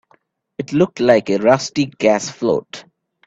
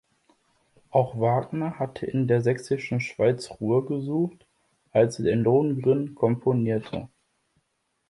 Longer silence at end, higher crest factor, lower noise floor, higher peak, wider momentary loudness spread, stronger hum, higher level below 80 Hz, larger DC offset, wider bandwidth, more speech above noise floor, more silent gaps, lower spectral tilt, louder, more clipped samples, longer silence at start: second, 0.45 s vs 1.05 s; about the same, 18 dB vs 18 dB; second, -58 dBFS vs -75 dBFS; first, 0 dBFS vs -8 dBFS; first, 19 LU vs 8 LU; neither; about the same, -56 dBFS vs -60 dBFS; neither; second, 8 kHz vs 11.5 kHz; second, 42 dB vs 51 dB; neither; second, -5 dB/octave vs -8 dB/octave; first, -17 LUFS vs -25 LUFS; neither; second, 0.6 s vs 0.95 s